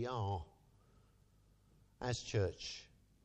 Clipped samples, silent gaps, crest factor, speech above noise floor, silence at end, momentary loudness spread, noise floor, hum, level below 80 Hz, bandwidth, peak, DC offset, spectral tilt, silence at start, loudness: under 0.1%; none; 20 dB; 30 dB; 0.4 s; 11 LU; -70 dBFS; none; -62 dBFS; 9 kHz; -24 dBFS; under 0.1%; -5 dB/octave; 0 s; -42 LUFS